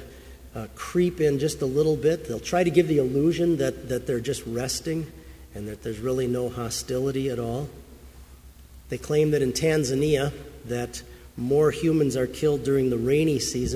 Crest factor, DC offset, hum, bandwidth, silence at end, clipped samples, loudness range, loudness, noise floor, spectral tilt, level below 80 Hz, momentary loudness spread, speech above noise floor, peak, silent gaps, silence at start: 18 dB; under 0.1%; none; 16 kHz; 0 s; under 0.1%; 6 LU; -25 LUFS; -48 dBFS; -5.5 dB/octave; -46 dBFS; 14 LU; 23 dB; -6 dBFS; none; 0 s